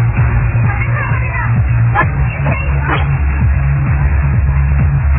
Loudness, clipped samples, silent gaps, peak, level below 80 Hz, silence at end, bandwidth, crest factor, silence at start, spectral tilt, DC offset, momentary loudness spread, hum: -14 LUFS; under 0.1%; none; 0 dBFS; -16 dBFS; 0 s; 3.5 kHz; 12 dB; 0 s; -11.5 dB/octave; 0.3%; 3 LU; none